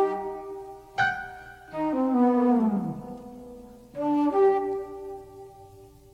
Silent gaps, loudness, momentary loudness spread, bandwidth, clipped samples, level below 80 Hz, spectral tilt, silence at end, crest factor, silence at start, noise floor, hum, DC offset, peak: none; -25 LUFS; 23 LU; 9 kHz; under 0.1%; -58 dBFS; -7.5 dB/octave; 0.3 s; 16 dB; 0 s; -50 dBFS; none; under 0.1%; -12 dBFS